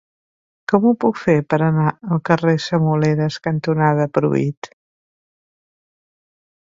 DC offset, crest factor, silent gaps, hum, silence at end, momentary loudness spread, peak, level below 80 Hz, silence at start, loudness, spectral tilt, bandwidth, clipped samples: under 0.1%; 18 dB; 4.57-4.62 s; none; 2 s; 6 LU; 0 dBFS; -58 dBFS; 0.7 s; -18 LUFS; -8 dB/octave; 7.6 kHz; under 0.1%